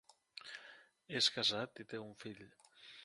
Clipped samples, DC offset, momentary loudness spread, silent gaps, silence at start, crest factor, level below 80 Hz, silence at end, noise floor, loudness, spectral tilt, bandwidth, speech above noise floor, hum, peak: under 0.1%; under 0.1%; 24 LU; none; 0.35 s; 24 dB; -82 dBFS; 0 s; -61 dBFS; -37 LUFS; -2 dB/octave; 11.5 kHz; 21 dB; none; -20 dBFS